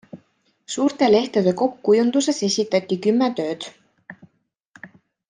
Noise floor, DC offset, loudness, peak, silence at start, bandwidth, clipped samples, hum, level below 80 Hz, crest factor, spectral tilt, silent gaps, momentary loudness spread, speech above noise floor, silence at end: -66 dBFS; under 0.1%; -20 LUFS; -6 dBFS; 0.15 s; 9.8 kHz; under 0.1%; none; -68 dBFS; 16 dB; -4.5 dB/octave; 4.65-4.74 s; 11 LU; 46 dB; 0.4 s